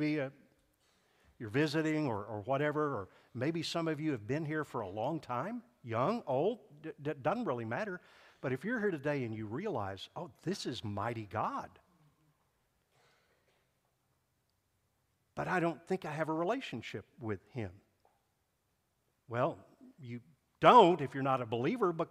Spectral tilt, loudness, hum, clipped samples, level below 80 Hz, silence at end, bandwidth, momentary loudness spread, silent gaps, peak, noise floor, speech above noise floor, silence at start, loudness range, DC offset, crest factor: -6.5 dB/octave; -35 LUFS; none; under 0.1%; -74 dBFS; 0.05 s; 14.5 kHz; 13 LU; none; -8 dBFS; -80 dBFS; 45 dB; 0 s; 12 LU; under 0.1%; 28 dB